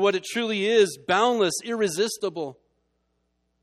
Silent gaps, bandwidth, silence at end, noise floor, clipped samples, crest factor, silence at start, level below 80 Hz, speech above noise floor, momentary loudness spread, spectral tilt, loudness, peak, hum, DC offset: none; 13.5 kHz; 1.1 s; -73 dBFS; under 0.1%; 18 dB; 0 s; -70 dBFS; 49 dB; 10 LU; -3 dB/octave; -24 LUFS; -8 dBFS; none; under 0.1%